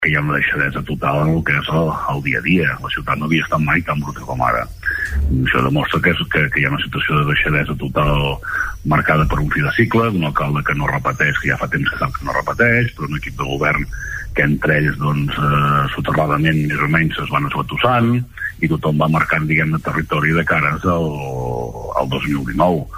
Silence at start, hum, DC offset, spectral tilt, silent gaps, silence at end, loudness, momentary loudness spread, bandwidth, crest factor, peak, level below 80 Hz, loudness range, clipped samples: 0 s; none; under 0.1%; -6.5 dB/octave; none; 0 s; -17 LUFS; 7 LU; 16 kHz; 16 dB; -2 dBFS; -32 dBFS; 2 LU; under 0.1%